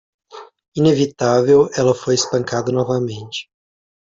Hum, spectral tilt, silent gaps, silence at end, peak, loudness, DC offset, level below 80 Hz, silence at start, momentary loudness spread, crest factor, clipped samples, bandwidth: none; -5.5 dB/octave; 0.68-0.72 s; 0.75 s; -2 dBFS; -17 LUFS; under 0.1%; -56 dBFS; 0.35 s; 15 LU; 16 dB; under 0.1%; 7.8 kHz